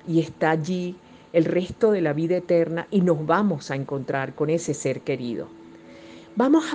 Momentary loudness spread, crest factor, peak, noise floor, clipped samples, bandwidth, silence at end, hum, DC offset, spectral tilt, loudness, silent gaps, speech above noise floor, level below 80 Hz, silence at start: 12 LU; 18 dB; -6 dBFS; -45 dBFS; under 0.1%; 9.6 kHz; 0 s; none; under 0.1%; -6.5 dB/octave; -24 LUFS; none; 22 dB; -62 dBFS; 0.05 s